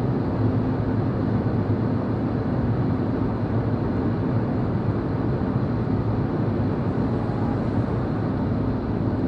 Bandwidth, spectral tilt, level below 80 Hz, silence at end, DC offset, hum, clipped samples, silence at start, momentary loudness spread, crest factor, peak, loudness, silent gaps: 5.4 kHz; -10.5 dB/octave; -38 dBFS; 0 s; under 0.1%; none; under 0.1%; 0 s; 2 LU; 12 dB; -10 dBFS; -24 LUFS; none